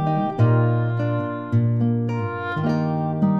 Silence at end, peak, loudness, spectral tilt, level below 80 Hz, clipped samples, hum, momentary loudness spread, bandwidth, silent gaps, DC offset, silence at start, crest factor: 0 s; -8 dBFS; -22 LUFS; -10 dB/octave; -60 dBFS; under 0.1%; none; 7 LU; 5 kHz; none; 0.2%; 0 s; 14 dB